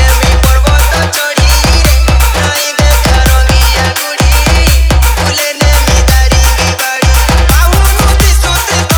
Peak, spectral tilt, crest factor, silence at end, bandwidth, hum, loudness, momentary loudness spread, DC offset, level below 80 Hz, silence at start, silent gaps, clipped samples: 0 dBFS; -3.5 dB/octave; 6 dB; 0 s; over 20 kHz; none; -8 LUFS; 3 LU; under 0.1%; -8 dBFS; 0 s; none; 0.2%